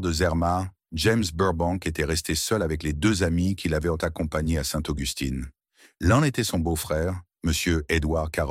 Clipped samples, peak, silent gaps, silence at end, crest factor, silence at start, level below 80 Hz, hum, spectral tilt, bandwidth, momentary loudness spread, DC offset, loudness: under 0.1%; -8 dBFS; none; 0 s; 18 dB; 0 s; -36 dBFS; none; -5 dB/octave; 16 kHz; 6 LU; under 0.1%; -25 LUFS